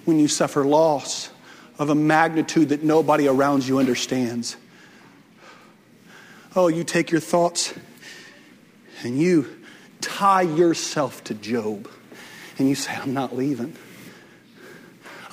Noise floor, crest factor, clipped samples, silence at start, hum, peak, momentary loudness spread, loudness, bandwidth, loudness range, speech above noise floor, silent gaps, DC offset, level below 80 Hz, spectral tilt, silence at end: -51 dBFS; 18 dB; under 0.1%; 0.05 s; none; -4 dBFS; 22 LU; -21 LUFS; 16 kHz; 7 LU; 30 dB; none; under 0.1%; -68 dBFS; -4.5 dB/octave; 0.05 s